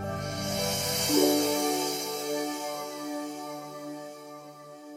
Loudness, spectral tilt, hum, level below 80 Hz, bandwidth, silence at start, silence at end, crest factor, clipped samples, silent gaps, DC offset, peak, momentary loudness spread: -29 LUFS; -3 dB/octave; none; -60 dBFS; 16 kHz; 0 s; 0 s; 20 dB; under 0.1%; none; under 0.1%; -10 dBFS; 20 LU